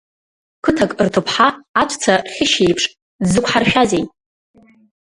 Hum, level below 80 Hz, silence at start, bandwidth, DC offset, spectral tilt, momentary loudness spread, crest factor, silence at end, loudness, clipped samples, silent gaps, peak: none; -46 dBFS; 0.65 s; 11.5 kHz; under 0.1%; -4 dB/octave; 7 LU; 18 dB; 0.95 s; -16 LUFS; under 0.1%; 1.69-1.74 s, 3.02-3.19 s; 0 dBFS